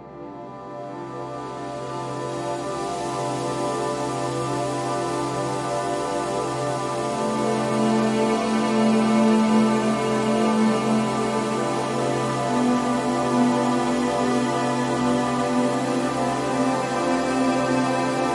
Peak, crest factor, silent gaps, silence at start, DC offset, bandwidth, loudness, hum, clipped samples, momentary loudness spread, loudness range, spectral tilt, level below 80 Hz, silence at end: -8 dBFS; 16 dB; none; 0 s; under 0.1%; 11.5 kHz; -23 LUFS; none; under 0.1%; 10 LU; 7 LU; -5.5 dB/octave; -54 dBFS; 0 s